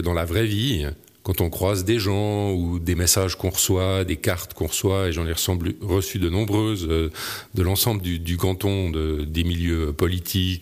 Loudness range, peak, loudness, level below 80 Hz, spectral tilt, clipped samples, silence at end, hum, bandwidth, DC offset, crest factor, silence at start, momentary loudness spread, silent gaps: 2 LU; -6 dBFS; -23 LUFS; -36 dBFS; -4.5 dB/octave; under 0.1%; 0 s; none; 15.5 kHz; under 0.1%; 18 dB; 0 s; 6 LU; none